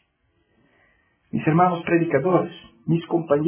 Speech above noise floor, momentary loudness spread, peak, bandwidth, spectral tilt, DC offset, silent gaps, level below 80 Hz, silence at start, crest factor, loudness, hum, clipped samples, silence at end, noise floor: 47 dB; 12 LU; -4 dBFS; 3.5 kHz; -11.5 dB/octave; under 0.1%; none; -60 dBFS; 1.35 s; 18 dB; -22 LUFS; none; under 0.1%; 0 s; -68 dBFS